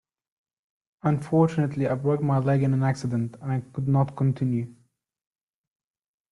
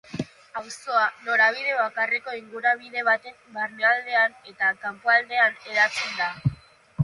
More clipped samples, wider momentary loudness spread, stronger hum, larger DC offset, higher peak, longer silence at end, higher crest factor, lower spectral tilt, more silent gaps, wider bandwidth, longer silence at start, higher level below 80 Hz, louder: neither; second, 7 LU vs 15 LU; neither; neither; about the same, -8 dBFS vs -8 dBFS; first, 1.6 s vs 0 s; about the same, 18 dB vs 18 dB; first, -9 dB/octave vs -4.5 dB/octave; neither; about the same, 10.5 kHz vs 11.5 kHz; first, 1.05 s vs 0.1 s; about the same, -62 dBFS vs -58 dBFS; about the same, -25 LUFS vs -23 LUFS